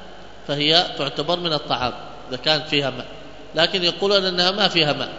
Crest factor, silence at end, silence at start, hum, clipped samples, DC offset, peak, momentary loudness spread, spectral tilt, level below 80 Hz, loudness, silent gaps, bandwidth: 22 dB; 0 s; 0 s; none; under 0.1%; 1%; 0 dBFS; 17 LU; -4 dB/octave; -50 dBFS; -19 LUFS; none; 8 kHz